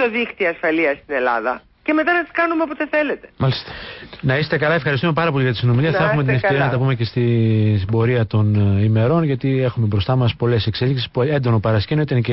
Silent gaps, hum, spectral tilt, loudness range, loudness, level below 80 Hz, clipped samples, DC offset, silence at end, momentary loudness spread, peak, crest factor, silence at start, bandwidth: none; none; -12 dB/octave; 2 LU; -18 LUFS; -42 dBFS; under 0.1%; under 0.1%; 0 s; 5 LU; -6 dBFS; 10 dB; 0 s; 5.8 kHz